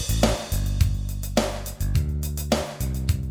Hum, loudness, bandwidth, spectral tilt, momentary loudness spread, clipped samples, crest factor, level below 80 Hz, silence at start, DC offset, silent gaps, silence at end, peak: none; -26 LUFS; over 20 kHz; -5 dB/octave; 6 LU; under 0.1%; 18 dB; -28 dBFS; 0 s; under 0.1%; none; 0 s; -6 dBFS